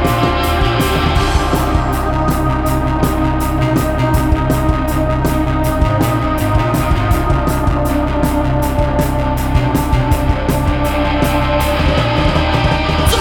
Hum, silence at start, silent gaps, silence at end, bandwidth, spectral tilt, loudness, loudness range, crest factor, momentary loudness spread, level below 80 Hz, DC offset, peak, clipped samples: none; 0 s; none; 0 s; over 20 kHz; -6 dB/octave; -15 LUFS; 1 LU; 14 dB; 2 LU; -18 dBFS; under 0.1%; 0 dBFS; under 0.1%